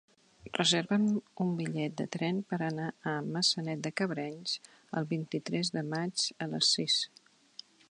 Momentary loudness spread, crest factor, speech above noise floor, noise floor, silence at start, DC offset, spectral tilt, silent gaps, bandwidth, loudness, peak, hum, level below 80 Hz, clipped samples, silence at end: 11 LU; 20 dB; 22 dB; -55 dBFS; 0.45 s; under 0.1%; -4 dB/octave; none; 10.5 kHz; -32 LUFS; -12 dBFS; none; -76 dBFS; under 0.1%; 0.85 s